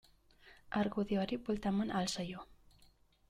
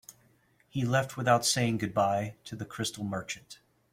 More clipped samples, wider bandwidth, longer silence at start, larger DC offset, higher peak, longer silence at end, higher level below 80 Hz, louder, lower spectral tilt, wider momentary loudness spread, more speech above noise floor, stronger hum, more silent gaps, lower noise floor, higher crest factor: neither; second, 13.5 kHz vs 16.5 kHz; first, 0.45 s vs 0.1 s; neither; second, -22 dBFS vs -10 dBFS; first, 0.75 s vs 0.4 s; about the same, -62 dBFS vs -64 dBFS; second, -37 LUFS vs -30 LUFS; first, -5.5 dB/octave vs -4 dB/octave; second, 7 LU vs 15 LU; second, 31 dB vs 36 dB; neither; neither; about the same, -67 dBFS vs -66 dBFS; second, 16 dB vs 22 dB